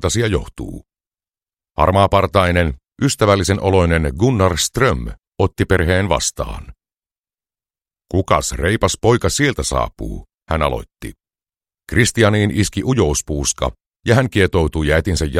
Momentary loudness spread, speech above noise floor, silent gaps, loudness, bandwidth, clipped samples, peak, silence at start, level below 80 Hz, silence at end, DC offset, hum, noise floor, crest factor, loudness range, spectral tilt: 13 LU; over 74 dB; 5.27-5.32 s, 7.18-7.24 s, 13.86-13.90 s; -17 LUFS; 15.5 kHz; under 0.1%; 0 dBFS; 0 s; -30 dBFS; 0 s; under 0.1%; none; under -90 dBFS; 18 dB; 4 LU; -5 dB/octave